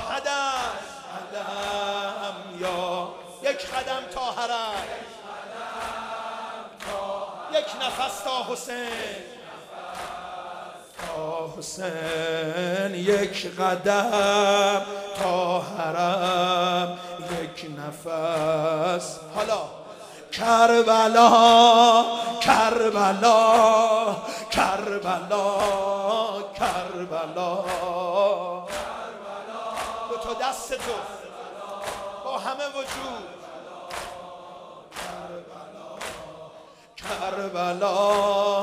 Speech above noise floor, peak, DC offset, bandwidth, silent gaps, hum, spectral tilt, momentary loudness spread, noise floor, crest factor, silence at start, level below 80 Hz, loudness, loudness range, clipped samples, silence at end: 26 dB; -2 dBFS; under 0.1%; 15.5 kHz; none; none; -3.5 dB/octave; 20 LU; -48 dBFS; 24 dB; 0 s; -58 dBFS; -23 LUFS; 16 LU; under 0.1%; 0 s